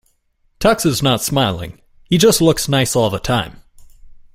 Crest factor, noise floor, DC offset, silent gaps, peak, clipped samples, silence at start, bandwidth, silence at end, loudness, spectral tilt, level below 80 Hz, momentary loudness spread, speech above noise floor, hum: 16 dB; -61 dBFS; under 0.1%; none; 0 dBFS; under 0.1%; 0.6 s; 16.5 kHz; 0.2 s; -15 LUFS; -4.5 dB/octave; -40 dBFS; 8 LU; 45 dB; none